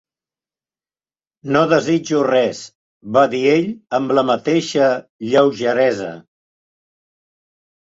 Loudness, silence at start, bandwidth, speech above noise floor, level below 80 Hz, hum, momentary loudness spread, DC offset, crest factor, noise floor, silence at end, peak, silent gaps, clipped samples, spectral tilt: -17 LUFS; 1.45 s; 8 kHz; over 74 dB; -62 dBFS; none; 8 LU; under 0.1%; 18 dB; under -90 dBFS; 1.65 s; -2 dBFS; 2.75-3.01 s, 5.09-5.19 s; under 0.1%; -5.5 dB/octave